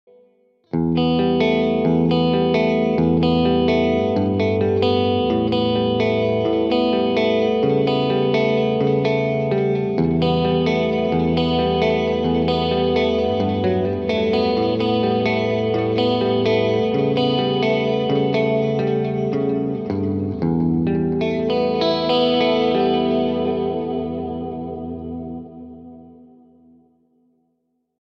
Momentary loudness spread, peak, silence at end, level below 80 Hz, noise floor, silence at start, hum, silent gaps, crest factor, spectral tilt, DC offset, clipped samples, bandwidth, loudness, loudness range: 6 LU; -6 dBFS; 1.9 s; -44 dBFS; -70 dBFS; 0.75 s; none; none; 14 dB; -8 dB/octave; under 0.1%; under 0.1%; 6.6 kHz; -19 LUFS; 4 LU